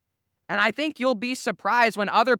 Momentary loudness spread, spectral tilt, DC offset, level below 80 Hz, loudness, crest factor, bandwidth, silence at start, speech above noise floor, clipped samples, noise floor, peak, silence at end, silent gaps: 7 LU; -3.5 dB/octave; under 0.1%; -76 dBFS; -23 LUFS; 18 dB; 17.5 kHz; 0.5 s; 30 dB; under 0.1%; -53 dBFS; -6 dBFS; 0 s; none